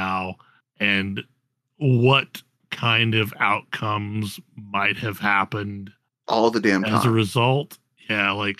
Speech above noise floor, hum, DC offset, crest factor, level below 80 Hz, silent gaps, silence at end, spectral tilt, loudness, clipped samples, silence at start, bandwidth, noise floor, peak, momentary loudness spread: 22 dB; none; under 0.1%; 20 dB; -66 dBFS; none; 0.05 s; -5.5 dB/octave; -21 LUFS; under 0.1%; 0 s; 14.5 kHz; -44 dBFS; -4 dBFS; 15 LU